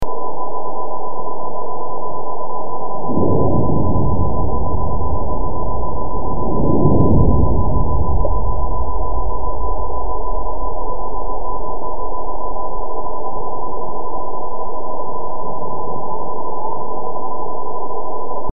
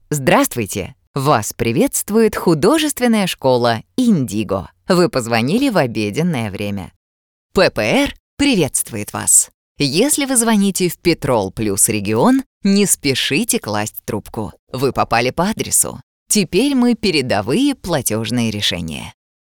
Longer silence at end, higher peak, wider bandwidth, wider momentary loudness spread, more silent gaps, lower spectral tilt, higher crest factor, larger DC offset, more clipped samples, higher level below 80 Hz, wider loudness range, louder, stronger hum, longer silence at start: second, 0 s vs 0.35 s; about the same, 0 dBFS vs 0 dBFS; second, 1.3 kHz vs over 20 kHz; about the same, 9 LU vs 9 LU; second, none vs 1.07-1.14 s, 6.96-7.50 s, 8.20-8.37 s, 9.54-9.75 s, 12.46-12.61 s, 14.59-14.67 s, 16.03-16.26 s; first, -13 dB/octave vs -4 dB/octave; about the same, 18 dB vs 16 dB; first, 30% vs under 0.1%; neither; first, -26 dBFS vs -44 dBFS; first, 8 LU vs 3 LU; second, -22 LUFS vs -16 LUFS; neither; about the same, 0 s vs 0.1 s